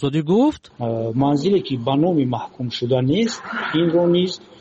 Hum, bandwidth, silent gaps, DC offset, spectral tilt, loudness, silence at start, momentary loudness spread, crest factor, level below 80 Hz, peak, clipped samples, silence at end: none; 8 kHz; none; under 0.1%; -7 dB/octave; -20 LUFS; 0 s; 8 LU; 12 dB; -54 dBFS; -8 dBFS; under 0.1%; 0.25 s